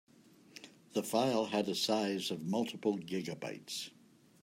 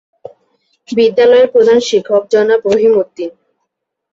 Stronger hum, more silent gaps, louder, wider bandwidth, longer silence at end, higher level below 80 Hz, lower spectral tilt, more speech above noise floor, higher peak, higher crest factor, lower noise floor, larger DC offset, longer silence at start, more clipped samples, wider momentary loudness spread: neither; neither; second, -36 LUFS vs -11 LUFS; first, 16 kHz vs 7.8 kHz; second, 0.55 s vs 0.85 s; second, -84 dBFS vs -58 dBFS; about the same, -4.5 dB/octave vs -4.5 dB/octave; second, 25 dB vs 62 dB; second, -18 dBFS vs 0 dBFS; first, 20 dB vs 12 dB; second, -60 dBFS vs -72 dBFS; neither; second, 0.55 s vs 0.9 s; neither; first, 18 LU vs 12 LU